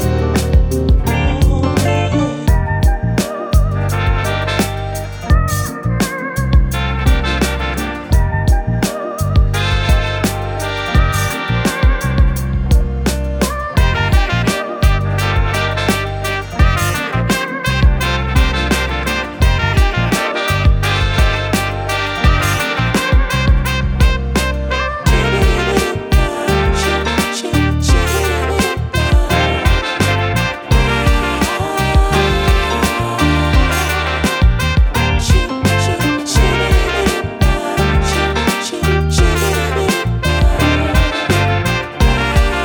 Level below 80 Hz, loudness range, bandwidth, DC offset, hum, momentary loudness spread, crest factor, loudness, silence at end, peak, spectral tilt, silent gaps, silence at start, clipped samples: -18 dBFS; 2 LU; over 20 kHz; under 0.1%; none; 4 LU; 14 dB; -15 LUFS; 0 s; 0 dBFS; -5 dB/octave; none; 0 s; under 0.1%